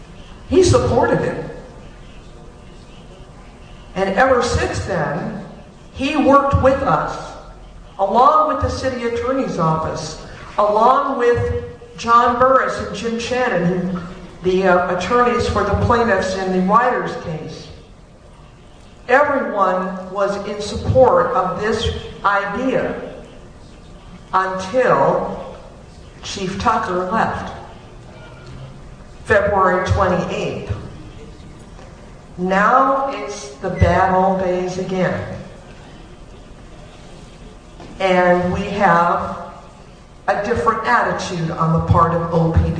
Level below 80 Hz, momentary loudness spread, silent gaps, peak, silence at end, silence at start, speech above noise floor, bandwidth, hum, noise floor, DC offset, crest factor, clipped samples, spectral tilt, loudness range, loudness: -36 dBFS; 20 LU; none; 0 dBFS; 0 s; 0 s; 26 dB; 10 kHz; none; -42 dBFS; under 0.1%; 18 dB; under 0.1%; -6 dB/octave; 5 LU; -17 LUFS